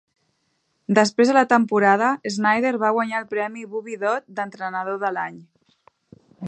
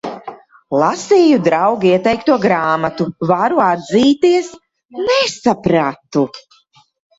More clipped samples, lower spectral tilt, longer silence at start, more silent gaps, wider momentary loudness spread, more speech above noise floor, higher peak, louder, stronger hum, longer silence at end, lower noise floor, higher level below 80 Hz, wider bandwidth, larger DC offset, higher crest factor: neither; about the same, -5 dB/octave vs -5.5 dB/octave; first, 0.9 s vs 0.05 s; second, none vs 4.85-4.89 s; about the same, 13 LU vs 11 LU; first, 50 dB vs 38 dB; about the same, -2 dBFS vs 0 dBFS; second, -21 LUFS vs -14 LUFS; neither; second, 0 s vs 0.8 s; first, -70 dBFS vs -52 dBFS; second, -74 dBFS vs -52 dBFS; first, 9.2 kHz vs 8 kHz; neither; first, 20 dB vs 14 dB